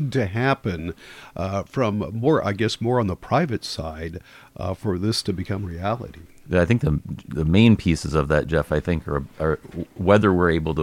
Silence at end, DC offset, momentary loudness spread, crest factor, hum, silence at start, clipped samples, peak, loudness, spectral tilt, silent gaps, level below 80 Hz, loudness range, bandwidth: 0 s; under 0.1%; 14 LU; 18 dB; none; 0 s; under 0.1%; -4 dBFS; -22 LUFS; -6.5 dB/octave; none; -38 dBFS; 5 LU; 15.5 kHz